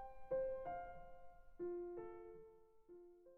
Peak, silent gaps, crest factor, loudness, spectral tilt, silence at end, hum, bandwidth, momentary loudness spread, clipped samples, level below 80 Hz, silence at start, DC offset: -34 dBFS; none; 16 dB; -49 LUFS; -9 dB/octave; 0 s; none; 3.3 kHz; 21 LU; under 0.1%; -66 dBFS; 0 s; under 0.1%